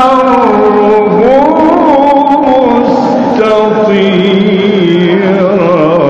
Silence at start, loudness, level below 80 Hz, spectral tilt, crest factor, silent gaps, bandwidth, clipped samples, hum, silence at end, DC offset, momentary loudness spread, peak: 0 s; -7 LUFS; -40 dBFS; -7.5 dB/octave; 6 dB; none; 8 kHz; under 0.1%; none; 0 s; under 0.1%; 2 LU; 0 dBFS